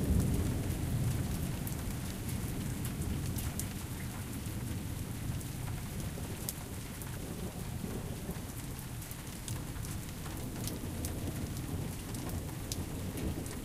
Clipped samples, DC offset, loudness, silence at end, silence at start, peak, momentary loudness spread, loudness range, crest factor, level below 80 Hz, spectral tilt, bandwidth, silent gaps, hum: under 0.1%; under 0.1%; -39 LUFS; 0 s; 0 s; -14 dBFS; 7 LU; 4 LU; 24 dB; -44 dBFS; -5.5 dB/octave; 16 kHz; none; none